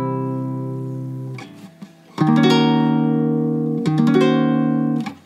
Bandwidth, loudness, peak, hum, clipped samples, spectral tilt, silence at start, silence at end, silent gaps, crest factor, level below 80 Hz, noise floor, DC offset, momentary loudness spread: 10.5 kHz; -18 LUFS; -2 dBFS; none; under 0.1%; -7.5 dB/octave; 0 s; 0.1 s; none; 16 dB; -74 dBFS; -42 dBFS; under 0.1%; 15 LU